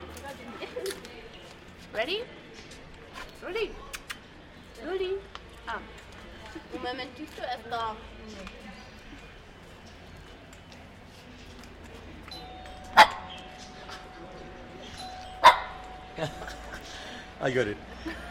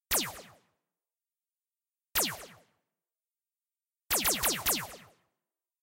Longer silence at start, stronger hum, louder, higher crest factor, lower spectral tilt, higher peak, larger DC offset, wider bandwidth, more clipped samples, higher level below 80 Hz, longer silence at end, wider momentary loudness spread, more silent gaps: about the same, 0 s vs 0.1 s; neither; about the same, -29 LUFS vs -29 LUFS; first, 28 dB vs 22 dB; first, -3.5 dB/octave vs -0.5 dB/octave; first, -4 dBFS vs -14 dBFS; neither; about the same, 16 kHz vs 16 kHz; neither; first, -52 dBFS vs -60 dBFS; second, 0 s vs 0.8 s; about the same, 20 LU vs 18 LU; neither